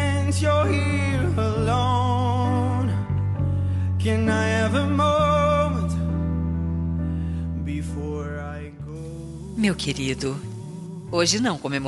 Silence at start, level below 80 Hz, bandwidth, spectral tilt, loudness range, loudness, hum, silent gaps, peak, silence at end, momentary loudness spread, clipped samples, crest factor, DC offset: 0 s; -40 dBFS; 11.5 kHz; -6 dB/octave; 7 LU; -23 LUFS; none; none; -8 dBFS; 0 s; 14 LU; under 0.1%; 16 dB; under 0.1%